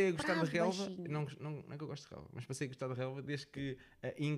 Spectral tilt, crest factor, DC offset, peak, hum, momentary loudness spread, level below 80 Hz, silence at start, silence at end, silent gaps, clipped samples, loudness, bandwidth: -6 dB/octave; 18 dB; under 0.1%; -22 dBFS; none; 12 LU; -70 dBFS; 0 s; 0 s; none; under 0.1%; -40 LUFS; 13 kHz